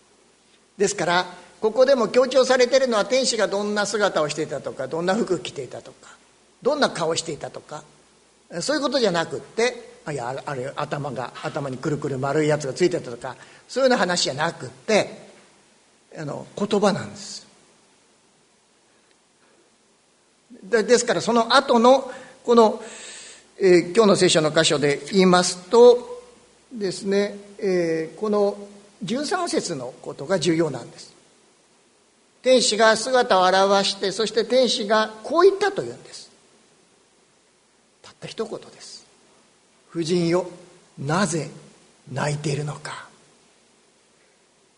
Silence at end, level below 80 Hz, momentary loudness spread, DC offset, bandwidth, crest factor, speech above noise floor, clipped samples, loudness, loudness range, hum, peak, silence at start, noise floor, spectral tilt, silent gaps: 1.7 s; -64 dBFS; 19 LU; under 0.1%; 11 kHz; 22 dB; 40 dB; under 0.1%; -21 LUFS; 10 LU; none; 0 dBFS; 0.8 s; -61 dBFS; -4 dB/octave; none